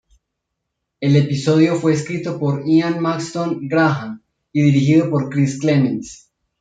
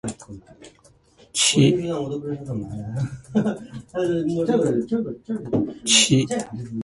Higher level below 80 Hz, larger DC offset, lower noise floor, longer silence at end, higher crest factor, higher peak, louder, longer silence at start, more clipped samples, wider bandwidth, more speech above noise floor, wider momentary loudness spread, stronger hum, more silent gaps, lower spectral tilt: about the same, -58 dBFS vs -54 dBFS; neither; first, -77 dBFS vs -55 dBFS; first, 0.45 s vs 0 s; about the same, 16 dB vs 20 dB; about the same, -2 dBFS vs -2 dBFS; first, -17 LUFS vs -22 LUFS; first, 1 s vs 0.05 s; neither; second, 9.2 kHz vs 11.5 kHz; first, 61 dB vs 33 dB; second, 10 LU vs 16 LU; neither; neither; first, -7 dB/octave vs -4 dB/octave